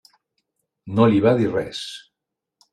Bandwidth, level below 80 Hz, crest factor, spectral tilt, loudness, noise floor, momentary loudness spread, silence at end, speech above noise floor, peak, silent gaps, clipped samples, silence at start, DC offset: 12 kHz; -58 dBFS; 20 dB; -7 dB/octave; -19 LUFS; -83 dBFS; 17 LU; 0.75 s; 64 dB; -4 dBFS; none; under 0.1%; 0.85 s; under 0.1%